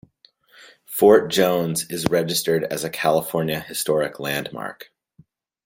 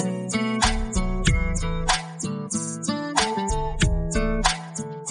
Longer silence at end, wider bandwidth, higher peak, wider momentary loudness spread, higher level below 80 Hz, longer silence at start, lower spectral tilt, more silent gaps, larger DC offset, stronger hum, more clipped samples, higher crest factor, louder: first, 0.8 s vs 0 s; first, 16.5 kHz vs 10 kHz; about the same, -2 dBFS vs -4 dBFS; first, 12 LU vs 6 LU; second, -58 dBFS vs -28 dBFS; first, 0.9 s vs 0 s; about the same, -4 dB/octave vs -4 dB/octave; neither; neither; neither; neither; about the same, 20 dB vs 20 dB; first, -21 LUFS vs -25 LUFS